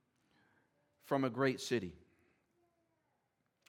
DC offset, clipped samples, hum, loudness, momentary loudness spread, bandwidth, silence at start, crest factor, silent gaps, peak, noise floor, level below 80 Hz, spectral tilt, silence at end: under 0.1%; under 0.1%; none; -37 LUFS; 5 LU; 16.5 kHz; 1.05 s; 22 dB; none; -20 dBFS; -82 dBFS; -80 dBFS; -5.5 dB/octave; 1.75 s